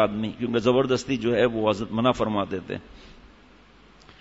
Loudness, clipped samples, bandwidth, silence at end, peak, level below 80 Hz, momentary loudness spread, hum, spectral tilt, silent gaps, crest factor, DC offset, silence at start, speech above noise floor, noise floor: -24 LUFS; under 0.1%; 8 kHz; 1.1 s; -6 dBFS; -52 dBFS; 9 LU; none; -6 dB/octave; none; 18 dB; under 0.1%; 0 s; 29 dB; -53 dBFS